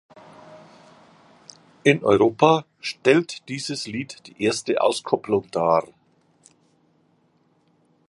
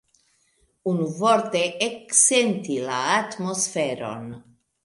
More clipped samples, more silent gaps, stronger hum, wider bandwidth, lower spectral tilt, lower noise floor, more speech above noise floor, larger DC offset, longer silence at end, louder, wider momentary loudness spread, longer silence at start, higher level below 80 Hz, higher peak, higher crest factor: neither; neither; neither; about the same, 11.5 kHz vs 11.5 kHz; first, -5 dB/octave vs -2.5 dB/octave; about the same, -63 dBFS vs -66 dBFS; about the same, 42 dB vs 43 dB; neither; first, 2.25 s vs 0.45 s; about the same, -22 LUFS vs -22 LUFS; about the same, 13 LU vs 15 LU; second, 0.5 s vs 0.85 s; first, -64 dBFS vs -70 dBFS; about the same, -2 dBFS vs -4 dBFS; about the same, 22 dB vs 20 dB